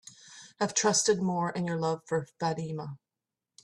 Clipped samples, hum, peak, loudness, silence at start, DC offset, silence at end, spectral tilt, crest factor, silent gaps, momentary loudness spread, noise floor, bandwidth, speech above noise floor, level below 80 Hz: under 0.1%; none; -14 dBFS; -29 LUFS; 0.05 s; under 0.1%; 0.65 s; -3.5 dB/octave; 18 dB; none; 24 LU; -90 dBFS; 12.5 kHz; 60 dB; -72 dBFS